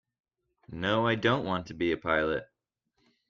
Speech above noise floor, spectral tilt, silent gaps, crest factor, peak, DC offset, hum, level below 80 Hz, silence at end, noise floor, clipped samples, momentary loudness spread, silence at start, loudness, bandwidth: 49 dB; -6.5 dB/octave; none; 20 dB; -12 dBFS; under 0.1%; none; -60 dBFS; 0.85 s; -78 dBFS; under 0.1%; 8 LU; 0.7 s; -29 LUFS; 7.4 kHz